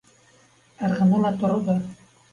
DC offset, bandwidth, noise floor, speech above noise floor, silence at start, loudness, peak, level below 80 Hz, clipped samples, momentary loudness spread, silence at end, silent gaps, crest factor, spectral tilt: under 0.1%; 7.2 kHz; -57 dBFS; 36 dB; 0.8 s; -22 LUFS; -10 dBFS; -58 dBFS; under 0.1%; 9 LU; 0.4 s; none; 14 dB; -8.5 dB/octave